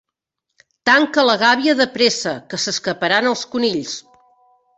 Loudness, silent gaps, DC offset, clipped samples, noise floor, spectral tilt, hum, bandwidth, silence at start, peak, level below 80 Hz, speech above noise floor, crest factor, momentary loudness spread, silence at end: -17 LUFS; none; under 0.1%; under 0.1%; -79 dBFS; -2.5 dB/octave; none; 8.4 kHz; 0.85 s; 0 dBFS; -62 dBFS; 62 dB; 18 dB; 10 LU; 0.75 s